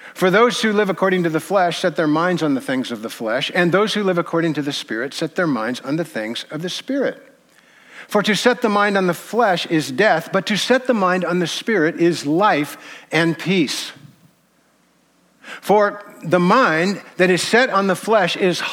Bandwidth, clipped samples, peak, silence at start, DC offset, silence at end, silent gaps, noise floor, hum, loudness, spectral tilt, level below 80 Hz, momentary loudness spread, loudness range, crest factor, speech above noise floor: 17 kHz; under 0.1%; -2 dBFS; 0 s; under 0.1%; 0 s; none; -59 dBFS; none; -18 LUFS; -5 dB/octave; -70 dBFS; 9 LU; 5 LU; 16 dB; 40 dB